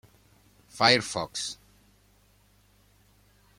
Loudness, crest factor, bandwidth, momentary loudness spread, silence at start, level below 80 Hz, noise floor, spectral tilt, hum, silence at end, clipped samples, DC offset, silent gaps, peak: -25 LUFS; 28 dB; 16.5 kHz; 24 LU; 0.75 s; -64 dBFS; -62 dBFS; -2.5 dB/octave; 50 Hz at -60 dBFS; 2.05 s; under 0.1%; under 0.1%; none; -4 dBFS